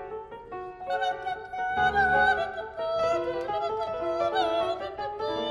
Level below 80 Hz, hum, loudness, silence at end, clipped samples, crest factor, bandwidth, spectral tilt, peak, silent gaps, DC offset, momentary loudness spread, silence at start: -54 dBFS; none; -28 LUFS; 0 s; under 0.1%; 16 dB; 11.5 kHz; -4.5 dB/octave; -12 dBFS; none; under 0.1%; 15 LU; 0 s